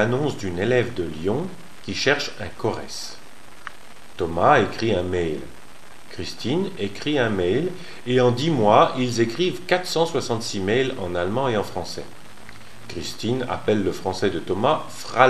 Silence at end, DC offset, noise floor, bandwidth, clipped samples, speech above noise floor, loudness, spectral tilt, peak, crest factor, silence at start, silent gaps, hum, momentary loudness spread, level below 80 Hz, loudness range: 0 s; 2%; -46 dBFS; 14 kHz; under 0.1%; 24 dB; -23 LUFS; -5 dB/octave; 0 dBFS; 24 dB; 0 s; none; none; 19 LU; -52 dBFS; 6 LU